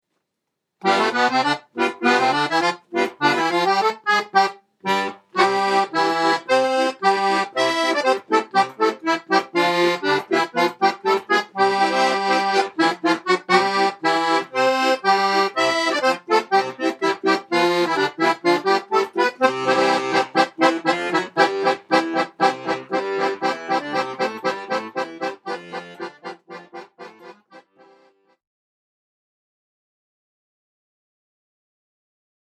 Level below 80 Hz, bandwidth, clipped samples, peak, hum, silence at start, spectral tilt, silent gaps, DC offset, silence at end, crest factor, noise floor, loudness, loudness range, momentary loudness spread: -82 dBFS; 14 kHz; under 0.1%; 0 dBFS; none; 0.85 s; -3.5 dB/octave; none; under 0.1%; 4.85 s; 20 dB; -79 dBFS; -20 LUFS; 7 LU; 7 LU